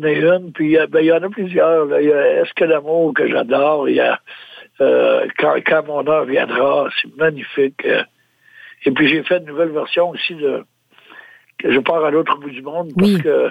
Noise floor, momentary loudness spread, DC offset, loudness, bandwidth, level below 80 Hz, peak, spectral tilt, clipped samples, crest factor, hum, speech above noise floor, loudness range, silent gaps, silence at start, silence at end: -48 dBFS; 8 LU; under 0.1%; -16 LUFS; 12 kHz; -60 dBFS; -2 dBFS; -7 dB/octave; under 0.1%; 14 dB; none; 32 dB; 4 LU; none; 0 s; 0 s